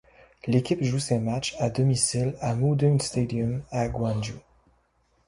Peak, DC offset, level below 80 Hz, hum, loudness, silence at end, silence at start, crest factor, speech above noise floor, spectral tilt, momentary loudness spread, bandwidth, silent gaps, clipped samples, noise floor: -8 dBFS; under 0.1%; -50 dBFS; none; -26 LUFS; 0.9 s; 0.45 s; 18 dB; 42 dB; -5.5 dB/octave; 7 LU; 11.5 kHz; none; under 0.1%; -67 dBFS